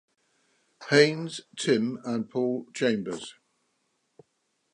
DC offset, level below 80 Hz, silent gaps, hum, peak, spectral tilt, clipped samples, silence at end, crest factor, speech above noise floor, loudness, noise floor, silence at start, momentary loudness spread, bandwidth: under 0.1%; -78 dBFS; none; none; -4 dBFS; -4.5 dB/octave; under 0.1%; 1.4 s; 24 dB; 49 dB; -27 LUFS; -75 dBFS; 0.8 s; 16 LU; 11 kHz